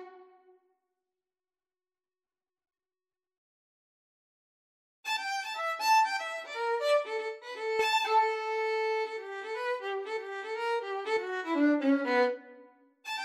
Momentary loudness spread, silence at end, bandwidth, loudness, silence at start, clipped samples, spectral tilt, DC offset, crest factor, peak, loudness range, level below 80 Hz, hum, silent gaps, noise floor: 11 LU; 0 s; 16 kHz; -30 LUFS; 0 s; under 0.1%; -1.5 dB/octave; under 0.1%; 16 dB; -16 dBFS; 7 LU; -86 dBFS; none; 3.37-5.03 s; under -90 dBFS